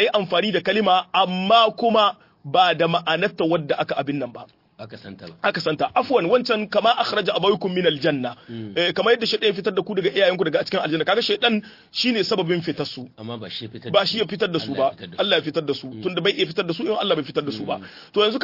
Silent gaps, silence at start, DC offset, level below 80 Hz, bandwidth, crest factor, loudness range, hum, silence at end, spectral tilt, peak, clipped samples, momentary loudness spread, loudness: none; 0 s; under 0.1%; -66 dBFS; 5.8 kHz; 18 dB; 4 LU; none; 0 s; -5.5 dB/octave; -4 dBFS; under 0.1%; 12 LU; -21 LUFS